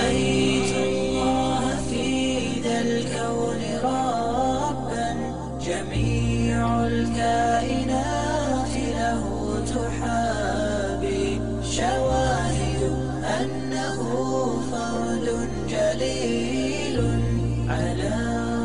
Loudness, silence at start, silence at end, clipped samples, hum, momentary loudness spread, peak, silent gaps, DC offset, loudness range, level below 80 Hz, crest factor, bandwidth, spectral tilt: -24 LUFS; 0 s; 0 s; under 0.1%; none; 5 LU; -12 dBFS; none; 1%; 2 LU; -36 dBFS; 12 dB; 10.5 kHz; -5.5 dB/octave